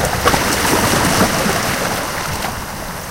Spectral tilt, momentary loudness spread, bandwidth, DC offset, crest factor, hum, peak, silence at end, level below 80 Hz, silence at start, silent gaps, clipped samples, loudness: -3 dB/octave; 10 LU; 17 kHz; under 0.1%; 16 dB; none; 0 dBFS; 0 s; -32 dBFS; 0 s; none; under 0.1%; -16 LUFS